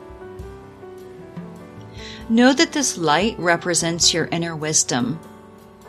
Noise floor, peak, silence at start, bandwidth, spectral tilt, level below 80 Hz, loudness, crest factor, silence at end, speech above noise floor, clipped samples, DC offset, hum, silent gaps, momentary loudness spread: -44 dBFS; -2 dBFS; 0 s; 14.5 kHz; -3 dB/octave; -48 dBFS; -18 LUFS; 20 dB; 0 s; 25 dB; under 0.1%; under 0.1%; none; none; 23 LU